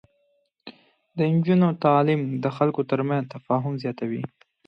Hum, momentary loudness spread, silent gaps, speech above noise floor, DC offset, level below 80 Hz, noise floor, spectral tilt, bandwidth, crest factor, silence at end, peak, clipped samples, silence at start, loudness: none; 11 LU; none; 46 dB; under 0.1%; -70 dBFS; -69 dBFS; -10 dB/octave; 5.8 kHz; 20 dB; 0.4 s; -6 dBFS; under 0.1%; 0.65 s; -23 LUFS